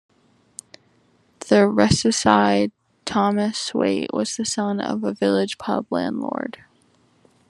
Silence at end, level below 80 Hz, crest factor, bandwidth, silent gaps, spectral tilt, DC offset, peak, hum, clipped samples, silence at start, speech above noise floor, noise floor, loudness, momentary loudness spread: 1 s; -52 dBFS; 22 dB; 11.5 kHz; none; -4.5 dB/octave; under 0.1%; 0 dBFS; none; under 0.1%; 1.4 s; 40 dB; -60 dBFS; -21 LUFS; 17 LU